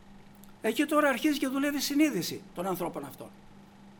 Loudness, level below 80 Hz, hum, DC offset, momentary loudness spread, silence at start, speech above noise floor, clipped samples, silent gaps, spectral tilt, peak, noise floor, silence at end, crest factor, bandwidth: -29 LUFS; -62 dBFS; none; under 0.1%; 16 LU; 0.05 s; 23 dB; under 0.1%; none; -4 dB/octave; -12 dBFS; -52 dBFS; 0.05 s; 18 dB; over 20 kHz